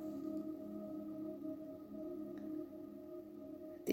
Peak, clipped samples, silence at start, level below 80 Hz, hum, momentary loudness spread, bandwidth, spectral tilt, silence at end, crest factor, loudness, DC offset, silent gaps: -22 dBFS; under 0.1%; 0 s; -78 dBFS; none; 7 LU; 16.5 kHz; -6.5 dB/octave; 0 s; 24 dB; -48 LUFS; under 0.1%; none